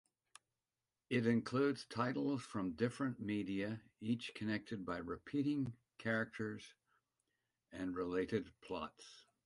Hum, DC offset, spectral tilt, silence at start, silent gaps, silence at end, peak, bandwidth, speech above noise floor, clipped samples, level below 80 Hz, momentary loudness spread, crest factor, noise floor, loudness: none; under 0.1%; -6.5 dB/octave; 1.1 s; none; 0.25 s; -22 dBFS; 11.5 kHz; over 50 dB; under 0.1%; -72 dBFS; 10 LU; 20 dB; under -90 dBFS; -41 LUFS